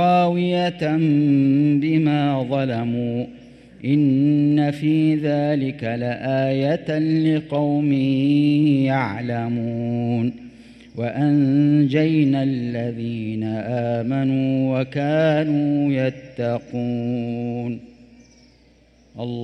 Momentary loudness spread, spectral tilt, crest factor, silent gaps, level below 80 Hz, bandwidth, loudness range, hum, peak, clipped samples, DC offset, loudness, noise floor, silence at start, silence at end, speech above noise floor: 9 LU; -9 dB/octave; 14 dB; none; -58 dBFS; 6.2 kHz; 3 LU; none; -6 dBFS; under 0.1%; under 0.1%; -20 LUFS; -54 dBFS; 0 s; 0 s; 34 dB